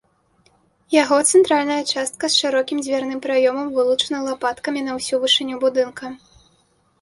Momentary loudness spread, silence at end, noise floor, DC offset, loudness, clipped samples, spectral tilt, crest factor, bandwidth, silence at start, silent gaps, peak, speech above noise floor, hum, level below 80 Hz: 9 LU; 0.85 s; -61 dBFS; under 0.1%; -19 LUFS; under 0.1%; -1.5 dB/octave; 18 dB; 11.5 kHz; 0.9 s; none; -2 dBFS; 42 dB; none; -64 dBFS